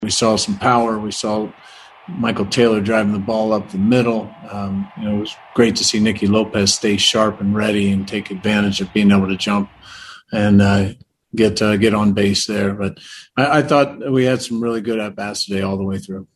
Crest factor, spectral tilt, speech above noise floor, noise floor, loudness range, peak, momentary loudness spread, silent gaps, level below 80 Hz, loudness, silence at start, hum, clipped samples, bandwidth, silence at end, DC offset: 18 dB; -4.5 dB/octave; 21 dB; -38 dBFS; 2 LU; 0 dBFS; 11 LU; none; -50 dBFS; -17 LUFS; 0 s; none; under 0.1%; 12.5 kHz; 0.1 s; under 0.1%